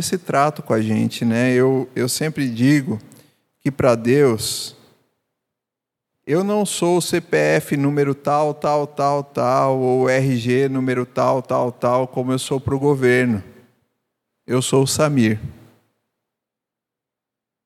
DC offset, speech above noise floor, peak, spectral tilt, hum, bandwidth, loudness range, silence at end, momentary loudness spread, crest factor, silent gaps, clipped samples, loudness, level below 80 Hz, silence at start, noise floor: under 0.1%; 67 dB; -2 dBFS; -5.5 dB/octave; none; 15.5 kHz; 4 LU; 2.15 s; 6 LU; 18 dB; none; under 0.1%; -19 LUFS; -56 dBFS; 0 s; -85 dBFS